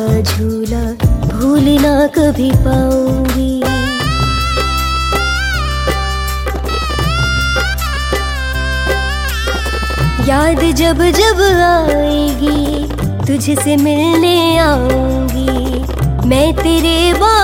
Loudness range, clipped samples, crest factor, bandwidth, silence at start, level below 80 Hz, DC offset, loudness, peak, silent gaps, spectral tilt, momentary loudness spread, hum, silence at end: 4 LU; under 0.1%; 12 dB; 17 kHz; 0 s; -20 dBFS; under 0.1%; -13 LUFS; 0 dBFS; none; -5 dB/octave; 7 LU; none; 0 s